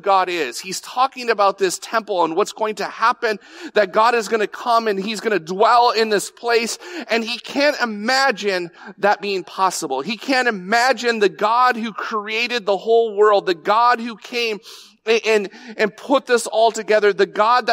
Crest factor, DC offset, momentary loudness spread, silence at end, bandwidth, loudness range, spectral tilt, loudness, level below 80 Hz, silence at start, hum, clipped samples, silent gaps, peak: 16 dB; under 0.1%; 8 LU; 0 s; 16 kHz; 2 LU; -3 dB/octave; -18 LUFS; -76 dBFS; 0.05 s; none; under 0.1%; none; -4 dBFS